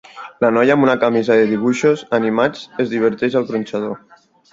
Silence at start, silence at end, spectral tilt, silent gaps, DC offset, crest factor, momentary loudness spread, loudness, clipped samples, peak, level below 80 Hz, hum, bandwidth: 0.15 s; 0.55 s; -6 dB/octave; none; under 0.1%; 16 dB; 10 LU; -17 LUFS; under 0.1%; 0 dBFS; -60 dBFS; none; 7.8 kHz